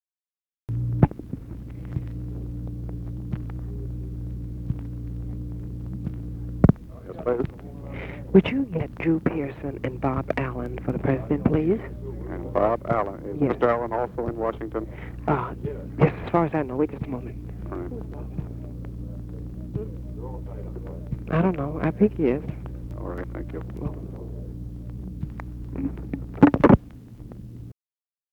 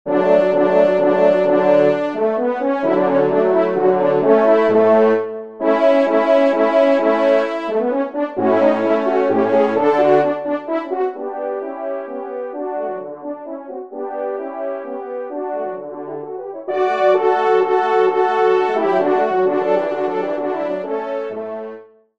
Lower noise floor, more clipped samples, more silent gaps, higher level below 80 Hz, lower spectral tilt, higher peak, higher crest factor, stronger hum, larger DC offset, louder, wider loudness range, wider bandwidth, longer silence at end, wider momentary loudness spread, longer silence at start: first, under -90 dBFS vs -38 dBFS; neither; neither; first, -38 dBFS vs -68 dBFS; first, -10 dB/octave vs -7 dB/octave; second, -4 dBFS vs 0 dBFS; first, 24 dB vs 16 dB; neither; second, under 0.1% vs 0.3%; second, -27 LUFS vs -17 LUFS; about the same, 10 LU vs 11 LU; second, 6.4 kHz vs 7.4 kHz; first, 0.6 s vs 0.35 s; first, 16 LU vs 13 LU; first, 0.7 s vs 0.05 s